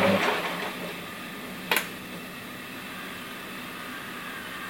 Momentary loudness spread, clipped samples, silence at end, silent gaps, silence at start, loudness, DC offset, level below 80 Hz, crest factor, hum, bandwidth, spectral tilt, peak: 11 LU; under 0.1%; 0 s; none; 0 s; -32 LUFS; under 0.1%; -64 dBFS; 26 dB; none; 17 kHz; -3.5 dB/octave; -6 dBFS